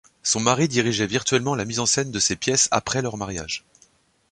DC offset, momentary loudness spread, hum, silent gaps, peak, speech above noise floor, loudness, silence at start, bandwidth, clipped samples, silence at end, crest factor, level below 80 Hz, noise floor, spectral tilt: under 0.1%; 10 LU; none; none; -2 dBFS; 37 dB; -22 LUFS; 0.25 s; 11.5 kHz; under 0.1%; 0.75 s; 22 dB; -52 dBFS; -59 dBFS; -3 dB/octave